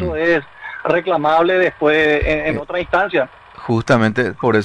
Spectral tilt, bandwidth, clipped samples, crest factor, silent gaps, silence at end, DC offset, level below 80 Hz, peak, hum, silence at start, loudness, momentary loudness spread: -6.5 dB/octave; 10 kHz; under 0.1%; 14 dB; none; 0 s; under 0.1%; -36 dBFS; -4 dBFS; none; 0 s; -16 LUFS; 8 LU